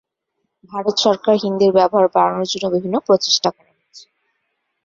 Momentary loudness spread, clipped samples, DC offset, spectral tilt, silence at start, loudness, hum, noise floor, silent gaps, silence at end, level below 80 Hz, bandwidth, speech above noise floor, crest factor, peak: 7 LU; under 0.1%; under 0.1%; -4 dB/octave; 0.7 s; -16 LUFS; none; -74 dBFS; none; 0.85 s; -62 dBFS; 7.6 kHz; 58 dB; 18 dB; -2 dBFS